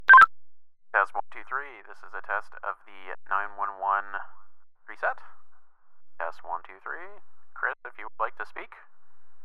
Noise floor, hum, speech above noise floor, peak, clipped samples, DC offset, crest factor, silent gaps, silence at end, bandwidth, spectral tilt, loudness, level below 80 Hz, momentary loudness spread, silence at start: -51 dBFS; none; 19 dB; -6 dBFS; under 0.1%; under 0.1%; 22 dB; none; 0 s; 12 kHz; -2.5 dB/octave; -26 LUFS; -74 dBFS; 17 LU; 0 s